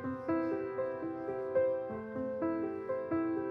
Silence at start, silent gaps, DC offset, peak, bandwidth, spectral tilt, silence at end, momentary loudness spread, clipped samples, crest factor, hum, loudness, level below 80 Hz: 0 s; none; under 0.1%; -22 dBFS; 5.2 kHz; -10 dB/octave; 0 s; 6 LU; under 0.1%; 14 dB; none; -36 LUFS; -70 dBFS